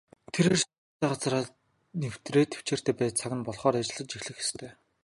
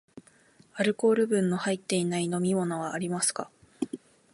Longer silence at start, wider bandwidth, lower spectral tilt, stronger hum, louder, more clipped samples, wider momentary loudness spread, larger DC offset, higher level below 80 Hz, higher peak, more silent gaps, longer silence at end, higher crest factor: first, 0.35 s vs 0.15 s; about the same, 11.5 kHz vs 11.5 kHz; about the same, -4.5 dB/octave vs -4.5 dB/octave; neither; about the same, -30 LUFS vs -28 LUFS; neither; about the same, 11 LU vs 13 LU; neither; first, -64 dBFS vs -72 dBFS; about the same, -10 dBFS vs -12 dBFS; first, 0.78-1.00 s vs none; about the same, 0.3 s vs 0.35 s; about the same, 20 dB vs 16 dB